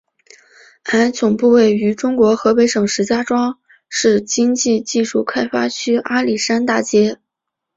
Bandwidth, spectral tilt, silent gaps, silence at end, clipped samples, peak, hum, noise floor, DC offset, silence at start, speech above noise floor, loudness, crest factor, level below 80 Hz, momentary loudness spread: 8 kHz; -4 dB/octave; none; 0.6 s; under 0.1%; -2 dBFS; none; -80 dBFS; under 0.1%; 0.85 s; 65 dB; -16 LUFS; 14 dB; -58 dBFS; 6 LU